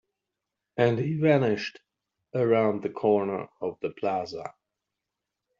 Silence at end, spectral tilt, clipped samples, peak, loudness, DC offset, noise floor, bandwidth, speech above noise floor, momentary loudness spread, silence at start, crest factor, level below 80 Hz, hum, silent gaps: 1.1 s; -6 dB/octave; under 0.1%; -8 dBFS; -27 LUFS; under 0.1%; -86 dBFS; 7.4 kHz; 60 dB; 14 LU; 0.75 s; 20 dB; -70 dBFS; none; none